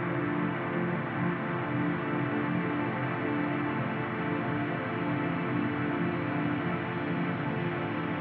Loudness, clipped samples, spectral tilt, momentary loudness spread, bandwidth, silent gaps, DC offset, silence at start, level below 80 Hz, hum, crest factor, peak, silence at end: -31 LUFS; under 0.1%; -6 dB/octave; 2 LU; 4.7 kHz; none; under 0.1%; 0 s; -64 dBFS; none; 14 dB; -16 dBFS; 0 s